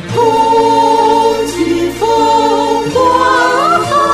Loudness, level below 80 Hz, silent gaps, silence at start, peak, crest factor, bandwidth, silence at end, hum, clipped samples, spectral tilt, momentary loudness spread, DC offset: -10 LUFS; -40 dBFS; none; 0 s; 0 dBFS; 10 dB; 15 kHz; 0 s; none; under 0.1%; -4.5 dB/octave; 5 LU; 0.1%